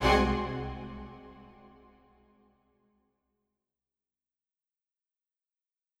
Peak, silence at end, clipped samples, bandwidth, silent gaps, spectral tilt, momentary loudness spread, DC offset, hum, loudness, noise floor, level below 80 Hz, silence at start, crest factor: -12 dBFS; 4.35 s; under 0.1%; 15 kHz; none; -5.5 dB/octave; 27 LU; under 0.1%; none; -31 LUFS; -90 dBFS; -44 dBFS; 0 s; 24 dB